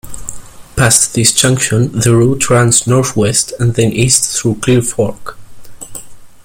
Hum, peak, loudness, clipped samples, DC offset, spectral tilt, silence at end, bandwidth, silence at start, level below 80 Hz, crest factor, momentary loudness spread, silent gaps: none; 0 dBFS; -11 LUFS; under 0.1%; under 0.1%; -4 dB/octave; 0.1 s; over 20 kHz; 0.05 s; -36 dBFS; 12 dB; 20 LU; none